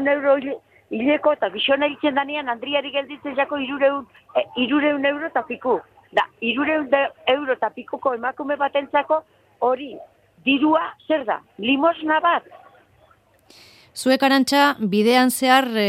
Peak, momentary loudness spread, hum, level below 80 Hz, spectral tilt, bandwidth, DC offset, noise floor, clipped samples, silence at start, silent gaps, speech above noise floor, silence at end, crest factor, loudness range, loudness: -2 dBFS; 9 LU; none; -66 dBFS; -3.5 dB/octave; 16 kHz; under 0.1%; -56 dBFS; under 0.1%; 0 s; none; 36 dB; 0 s; 18 dB; 2 LU; -21 LUFS